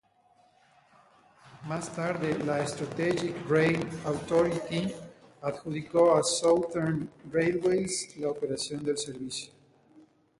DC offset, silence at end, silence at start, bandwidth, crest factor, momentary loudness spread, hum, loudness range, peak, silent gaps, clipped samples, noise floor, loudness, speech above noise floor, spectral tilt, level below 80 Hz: under 0.1%; 0.4 s; 1.45 s; 11.5 kHz; 18 dB; 12 LU; none; 4 LU; -12 dBFS; none; under 0.1%; -64 dBFS; -29 LUFS; 36 dB; -5 dB/octave; -64 dBFS